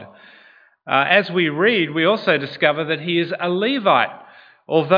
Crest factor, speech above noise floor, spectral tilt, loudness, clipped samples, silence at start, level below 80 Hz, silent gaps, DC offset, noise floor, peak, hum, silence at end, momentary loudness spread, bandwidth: 18 dB; 33 dB; -7.5 dB/octave; -18 LUFS; under 0.1%; 0 s; -70 dBFS; none; under 0.1%; -51 dBFS; 0 dBFS; none; 0 s; 6 LU; 5.2 kHz